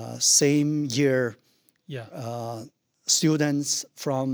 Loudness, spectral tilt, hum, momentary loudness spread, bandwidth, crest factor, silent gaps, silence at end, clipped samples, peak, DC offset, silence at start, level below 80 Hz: -23 LUFS; -3.5 dB/octave; none; 18 LU; over 20 kHz; 18 dB; none; 0 s; under 0.1%; -6 dBFS; under 0.1%; 0 s; -74 dBFS